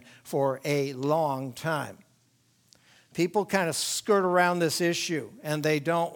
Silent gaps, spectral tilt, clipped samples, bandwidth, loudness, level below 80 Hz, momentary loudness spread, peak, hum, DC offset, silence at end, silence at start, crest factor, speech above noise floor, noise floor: none; -4.5 dB/octave; under 0.1%; 19.5 kHz; -27 LUFS; -74 dBFS; 9 LU; -8 dBFS; none; under 0.1%; 0 s; 0.25 s; 20 dB; 40 dB; -66 dBFS